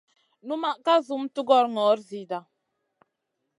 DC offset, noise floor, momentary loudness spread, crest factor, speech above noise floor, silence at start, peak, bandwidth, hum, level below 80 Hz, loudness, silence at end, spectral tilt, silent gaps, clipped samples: under 0.1%; -80 dBFS; 14 LU; 20 dB; 56 dB; 0.45 s; -6 dBFS; 11 kHz; none; -84 dBFS; -25 LUFS; 1.2 s; -5 dB/octave; none; under 0.1%